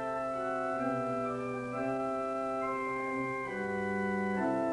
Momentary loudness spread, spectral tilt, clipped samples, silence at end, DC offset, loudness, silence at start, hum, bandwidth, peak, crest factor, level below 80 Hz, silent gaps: 3 LU; -7 dB/octave; under 0.1%; 0 s; under 0.1%; -34 LUFS; 0 s; none; 11.5 kHz; -22 dBFS; 12 dB; -66 dBFS; none